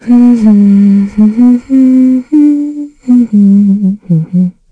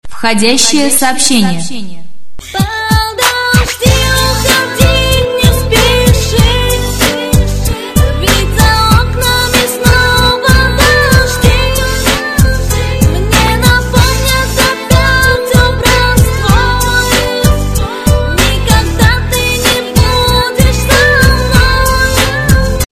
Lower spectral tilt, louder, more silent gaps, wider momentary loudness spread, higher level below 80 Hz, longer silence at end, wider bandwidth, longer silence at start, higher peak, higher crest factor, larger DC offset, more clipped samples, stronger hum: first, -10 dB/octave vs -4 dB/octave; about the same, -7 LUFS vs -9 LUFS; neither; about the same, 7 LU vs 5 LU; second, -44 dBFS vs -16 dBFS; first, 0.2 s vs 0.05 s; second, 7.6 kHz vs 15 kHz; about the same, 0.05 s vs 0.05 s; about the same, 0 dBFS vs 0 dBFS; about the same, 6 dB vs 8 dB; neither; second, under 0.1% vs 1%; neither